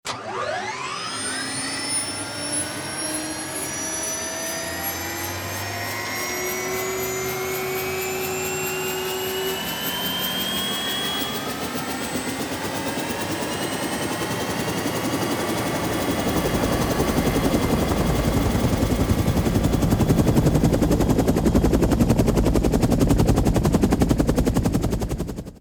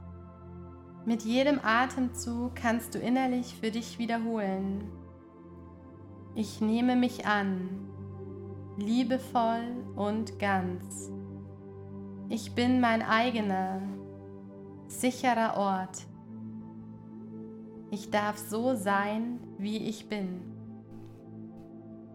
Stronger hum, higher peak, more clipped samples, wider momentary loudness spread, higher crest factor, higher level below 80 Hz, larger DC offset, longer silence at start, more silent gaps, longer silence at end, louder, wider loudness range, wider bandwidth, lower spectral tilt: neither; first, -6 dBFS vs -12 dBFS; neither; second, 7 LU vs 21 LU; about the same, 18 dB vs 20 dB; first, -32 dBFS vs -64 dBFS; neither; about the same, 0.05 s vs 0 s; neither; about the same, 0 s vs 0 s; first, -23 LUFS vs -31 LUFS; about the same, 6 LU vs 5 LU; first, over 20 kHz vs 16 kHz; about the same, -4.5 dB/octave vs -5 dB/octave